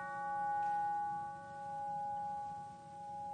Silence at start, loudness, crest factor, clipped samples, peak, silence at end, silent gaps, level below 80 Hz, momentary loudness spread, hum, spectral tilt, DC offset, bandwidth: 0 s; -41 LUFS; 10 dB; under 0.1%; -30 dBFS; 0 s; none; -76 dBFS; 12 LU; none; -5 dB/octave; under 0.1%; 9.4 kHz